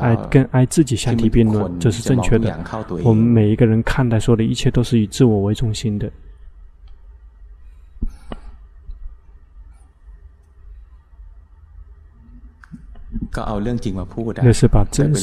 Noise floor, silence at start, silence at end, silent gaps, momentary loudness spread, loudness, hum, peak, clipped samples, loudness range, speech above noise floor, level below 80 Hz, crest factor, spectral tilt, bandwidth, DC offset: -44 dBFS; 0 s; 0 s; none; 16 LU; -17 LUFS; none; 0 dBFS; under 0.1%; 23 LU; 28 dB; -30 dBFS; 18 dB; -7 dB/octave; 13 kHz; under 0.1%